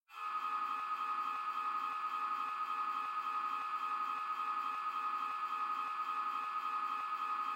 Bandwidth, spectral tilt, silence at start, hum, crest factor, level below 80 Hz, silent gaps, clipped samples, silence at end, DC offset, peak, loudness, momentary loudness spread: 16 kHz; -1 dB/octave; 0.1 s; none; 10 dB; -86 dBFS; none; under 0.1%; 0 s; under 0.1%; -28 dBFS; -38 LUFS; 1 LU